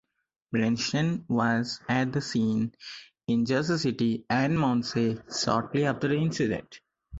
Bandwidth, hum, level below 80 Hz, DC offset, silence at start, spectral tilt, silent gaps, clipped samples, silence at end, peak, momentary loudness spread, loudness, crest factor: 8 kHz; none; -58 dBFS; under 0.1%; 0.5 s; -5.5 dB/octave; none; under 0.1%; 0 s; -10 dBFS; 5 LU; -27 LUFS; 18 dB